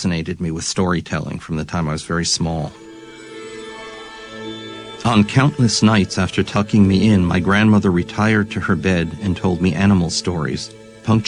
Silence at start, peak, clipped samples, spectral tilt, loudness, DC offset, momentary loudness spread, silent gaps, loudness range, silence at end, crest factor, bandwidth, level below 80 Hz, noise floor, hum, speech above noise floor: 0 s; -2 dBFS; under 0.1%; -5.5 dB/octave; -17 LUFS; under 0.1%; 18 LU; none; 9 LU; 0 s; 16 dB; 10.5 kHz; -42 dBFS; -37 dBFS; none; 20 dB